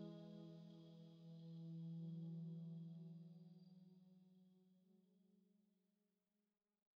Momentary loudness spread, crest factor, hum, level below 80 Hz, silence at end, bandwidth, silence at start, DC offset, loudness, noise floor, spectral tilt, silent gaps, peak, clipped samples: 13 LU; 14 dB; none; under -90 dBFS; 1.35 s; 5.6 kHz; 0 s; under 0.1%; -57 LUFS; under -90 dBFS; -10 dB/octave; none; -46 dBFS; under 0.1%